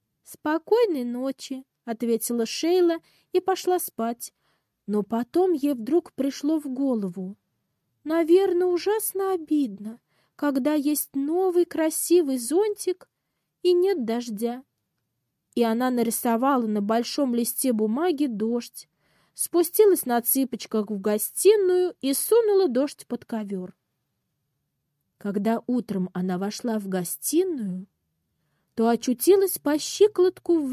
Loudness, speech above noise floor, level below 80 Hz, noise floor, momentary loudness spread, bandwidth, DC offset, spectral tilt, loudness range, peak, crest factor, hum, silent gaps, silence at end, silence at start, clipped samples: -24 LUFS; 55 dB; -74 dBFS; -79 dBFS; 13 LU; 16 kHz; under 0.1%; -4.5 dB/octave; 5 LU; -8 dBFS; 18 dB; none; none; 0 s; 0.3 s; under 0.1%